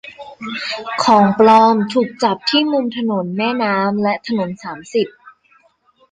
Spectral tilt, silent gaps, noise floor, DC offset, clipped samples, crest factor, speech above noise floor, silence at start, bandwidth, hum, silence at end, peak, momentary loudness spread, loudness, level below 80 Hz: -5.5 dB/octave; none; -56 dBFS; under 0.1%; under 0.1%; 16 dB; 40 dB; 0.05 s; 9.4 kHz; none; 0.8 s; -2 dBFS; 14 LU; -16 LUFS; -60 dBFS